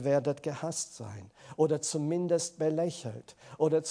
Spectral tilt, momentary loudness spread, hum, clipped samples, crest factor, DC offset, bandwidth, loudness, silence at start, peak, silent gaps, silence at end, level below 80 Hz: -5 dB/octave; 17 LU; none; under 0.1%; 16 dB; under 0.1%; 10.5 kHz; -31 LUFS; 0 s; -14 dBFS; none; 0 s; -76 dBFS